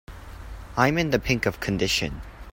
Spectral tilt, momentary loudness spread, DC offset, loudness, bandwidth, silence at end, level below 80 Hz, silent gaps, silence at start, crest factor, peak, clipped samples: -4.5 dB/octave; 20 LU; under 0.1%; -24 LUFS; 16.5 kHz; 0 s; -40 dBFS; none; 0.1 s; 22 dB; -4 dBFS; under 0.1%